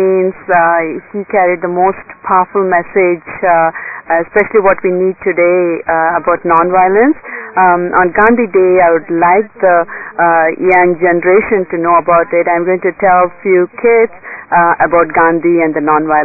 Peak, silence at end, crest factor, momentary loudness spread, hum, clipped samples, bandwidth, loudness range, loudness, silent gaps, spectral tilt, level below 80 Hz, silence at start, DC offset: 0 dBFS; 0 s; 10 dB; 5 LU; none; under 0.1%; 2.7 kHz; 2 LU; -11 LUFS; none; -11.5 dB/octave; -46 dBFS; 0 s; under 0.1%